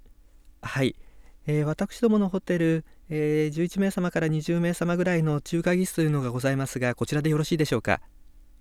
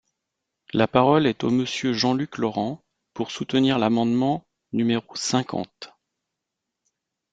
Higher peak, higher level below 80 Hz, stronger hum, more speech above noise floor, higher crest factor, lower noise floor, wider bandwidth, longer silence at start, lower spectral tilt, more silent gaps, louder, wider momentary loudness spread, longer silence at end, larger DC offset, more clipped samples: second, -6 dBFS vs -2 dBFS; first, -52 dBFS vs -62 dBFS; neither; second, 28 dB vs 61 dB; about the same, 20 dB vs 22 dB; second, -53 dBFS vs -83 dBFS; first, 15 kHz vs 9.2 kHz; second, 0.45 s vs 0.75 s; about the same, -6.5 dB/octave vs -5.5 dB/octave; neither; second, -26 LUFS vs -23 LUFS; second, 5 LU vs 13 LU; second, 0.2 s vs 1.45 s; neither; neither